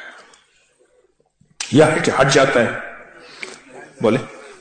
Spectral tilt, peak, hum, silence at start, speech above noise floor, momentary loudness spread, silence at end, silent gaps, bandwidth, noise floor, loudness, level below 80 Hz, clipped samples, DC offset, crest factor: -4.5 dB/octave; -2 dBFS; none; 0 s; 45 dB; 23 LU; 0.1 s; none; 9.4 kHz; -60 dBFS; -16 LUFS; -52 dBFS; under 0.1%; under 0.1%; 18 dB